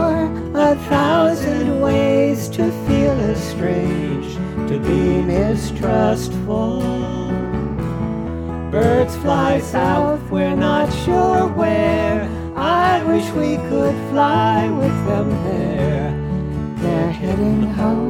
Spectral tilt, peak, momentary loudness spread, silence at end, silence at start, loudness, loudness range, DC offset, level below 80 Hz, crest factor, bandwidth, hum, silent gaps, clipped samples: -7 dB/octave; -2 dBFS; 7 LU; 0 s; 0 s; -18 LUFS; 3 LU; under 0.1%; -34 dBFS; 16 dB; 17.5 kHz; none; none; under 0.1%